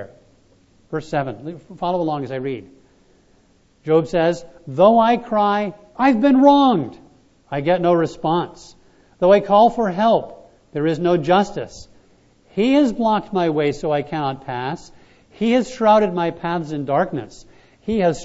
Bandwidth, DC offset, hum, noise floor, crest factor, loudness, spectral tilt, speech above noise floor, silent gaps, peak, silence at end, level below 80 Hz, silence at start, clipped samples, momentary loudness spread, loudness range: 8 kHz; under 0.1%; none; -56 dBFS; 18 dB; -18 LUFS; -7 dB/octave; 38 dB; none; 0 dBFS; 0 s; -50 dBFS; 0 s; under 0.1%; 16 LU; 7 LU